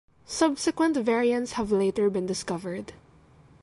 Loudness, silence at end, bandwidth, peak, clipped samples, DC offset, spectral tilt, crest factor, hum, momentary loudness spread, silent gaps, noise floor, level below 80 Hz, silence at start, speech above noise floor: -26 LUFS; 0.65 s; 11.5 kHz; -8 dBFS; under 0.1%; under 0.1%; -4.5 dB/octave; 18 dB; none; 12 LU; none; -56 dBFS; -58 dBFS; 0.3 s; 30 dB